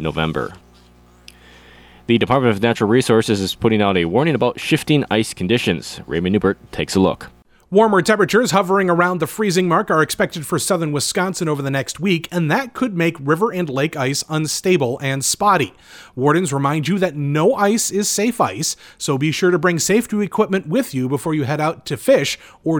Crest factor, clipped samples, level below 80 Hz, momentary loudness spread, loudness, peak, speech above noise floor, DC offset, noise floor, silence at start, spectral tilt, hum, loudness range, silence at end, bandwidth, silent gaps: 14 dB; under 0.1%; -50 dBFS; 6 LU; -18 LUFS; -2 dBFS; 31 dB; under 0.1%; -49 dBFS; 0 s; -4.5 dB/octave; none; 3 LU; 0 s; 20 kHz; none